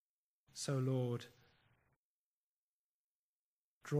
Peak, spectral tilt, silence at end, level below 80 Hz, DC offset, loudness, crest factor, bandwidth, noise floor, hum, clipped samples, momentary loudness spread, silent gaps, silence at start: -24 dBFS; -6 dB/octave; 0 s; -86 dBFS; under 0.1%; -40 LUFS; 20 dB; 15 kHz; under -90 dBFS; none; under 0.1%; 20 LU; 1.96-3.81 s; 0.55 s